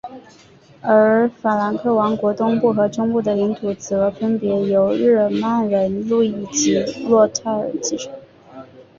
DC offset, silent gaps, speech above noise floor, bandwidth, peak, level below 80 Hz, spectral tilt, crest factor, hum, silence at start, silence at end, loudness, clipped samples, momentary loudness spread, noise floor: under 0.1%; none; 23 dB; 7.6 kHz; -2 dBFS; -58 dBFS; -5 dB/octave; 16 dB; none; 0.05 s; 0.15 s; -18 LUFS; under 0.1%; 7 LU; -41 dBFS